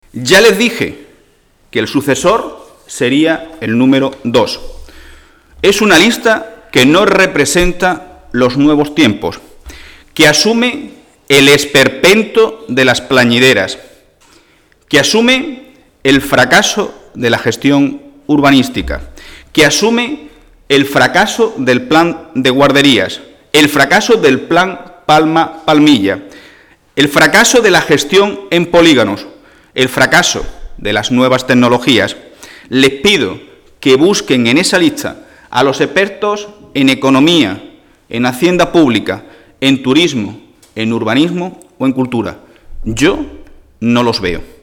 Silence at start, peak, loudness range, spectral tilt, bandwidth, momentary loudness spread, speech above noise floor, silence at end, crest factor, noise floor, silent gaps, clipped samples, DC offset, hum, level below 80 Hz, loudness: 0.15 s; 0 dBFS; 4 LU; -4 dB/octave; 19.5 kHz; 14 LU; 40 dB; 0.2 s; 12 dB; -50 dBFS; none; under 0.1%; under 0.1%; none; -36 dBFS; -10 LUFS